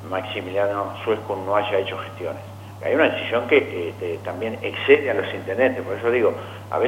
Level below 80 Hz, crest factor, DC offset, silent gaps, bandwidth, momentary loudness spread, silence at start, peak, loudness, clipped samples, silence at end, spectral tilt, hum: -66 dBFS; 20 dB; under 0.1%; none; 16 kHz; 13 LU; 0 s; -2 dBFS; -22 LUFS; under 0.1%; 0 s; -6 dB/octave; none